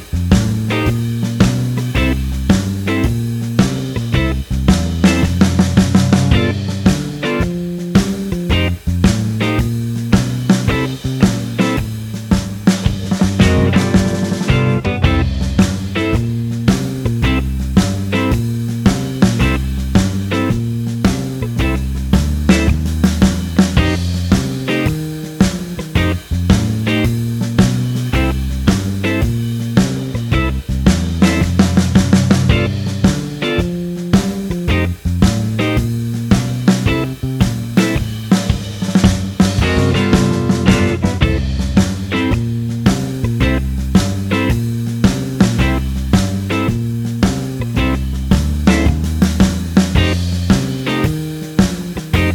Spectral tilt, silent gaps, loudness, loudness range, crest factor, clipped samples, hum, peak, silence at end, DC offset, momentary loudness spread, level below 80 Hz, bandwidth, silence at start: -6 dB/octave; none; -16 LUFS; 2 LU; 14 dB; under 0.1%; none; 0 dBFS; 0 s; under 0.1%; 6 LU; -24 dBFS; 18.5 kHz; 0 s